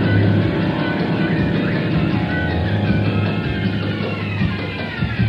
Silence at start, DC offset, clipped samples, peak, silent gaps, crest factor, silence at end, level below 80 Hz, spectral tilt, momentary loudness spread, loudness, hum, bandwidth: 0 s; under 0.1%; under 0.1%; -4 dBFS; none; 14 dB; 0 s; -36 dBFS; -9 dB/octave; 5 LU; -19 LUFS; none; 5.8 kHz